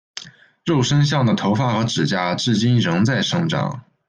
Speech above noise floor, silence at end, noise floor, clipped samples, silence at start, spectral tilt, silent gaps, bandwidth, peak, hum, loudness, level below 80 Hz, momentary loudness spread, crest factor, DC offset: 21 dB; 0.3 s; -39 dBFS; under 0.1%; 0.15 s; -5.5 dB/octave; none; 9.6 kHz; -6 dBFS; none; -19 LUFS; -54 dBFS; 9 LU; 14 dB; under 0.1%